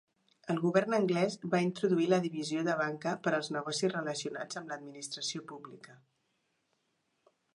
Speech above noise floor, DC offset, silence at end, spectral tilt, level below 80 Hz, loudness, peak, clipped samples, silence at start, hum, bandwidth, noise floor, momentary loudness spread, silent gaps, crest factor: 46 dB; under 0.1%; 1.6 s; -5 dB/octave; -84 dBFS; -33 LUFS; -14 dBFS; under 0.1%; 0.45 s; none; 11.5 kHz; -79 dBFS; 13 LU; none; 20 dB